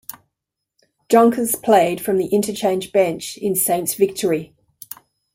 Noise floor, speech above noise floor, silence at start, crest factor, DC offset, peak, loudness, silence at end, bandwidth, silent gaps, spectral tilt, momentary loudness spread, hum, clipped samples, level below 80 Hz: -81 dBFS; 63 dB; 1.1 s; 18 dB; under 0.1%; -2 dBFS; -18 LUFS; 0.9 s; 16.5 kHz; none; -4 dB/octave; 21 LU; none; under 0.1%; -62 dBFS